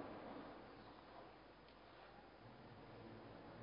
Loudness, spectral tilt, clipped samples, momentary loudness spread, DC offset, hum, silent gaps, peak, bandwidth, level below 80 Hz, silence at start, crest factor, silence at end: -59 LUFS; -4.5 dB/octave; under 0.1%; 8 LU; under 0.1%; none; none; -40 dBFS; 5.2 kHz; -74 dBFS; 0 s; 18 dB; 0 s